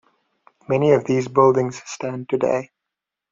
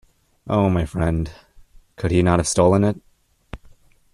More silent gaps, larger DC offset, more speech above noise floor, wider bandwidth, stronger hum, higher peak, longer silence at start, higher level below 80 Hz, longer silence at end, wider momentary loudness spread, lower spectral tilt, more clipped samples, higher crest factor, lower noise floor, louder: neither; neither; first, 65 dB vs 31 dB; second, 7.6 kHz vs 12.5 kHz; neither; about the same, -2 dBFS vs -2 dBFS; first, 0.7 s vs 0.45 s; second, -62 dBFS vs -40 dBFS; about the same, 0.65 s vs 0.6 s; second, 12 LU vs 25 LU; about the same, -6.5 dB/octave vs -6 dB/octave; neither; about the same, 18 dB vs 18 dB; first, -84 dBFS vs -50 dBFS; about the same, -20 LUFS vs -20 LUFS